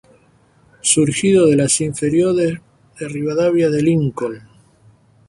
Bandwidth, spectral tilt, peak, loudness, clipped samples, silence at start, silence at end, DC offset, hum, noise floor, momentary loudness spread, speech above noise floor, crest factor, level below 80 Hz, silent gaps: 11.5 kHz; -5 dB/octave; 0 dBFS; -16 LUFS; under 0.1%; 0.85 s; 0.9 s; under 0.1%; none; -54 dBFS; 14 LU; 38 dB; 16 dB; -52 dBFS; none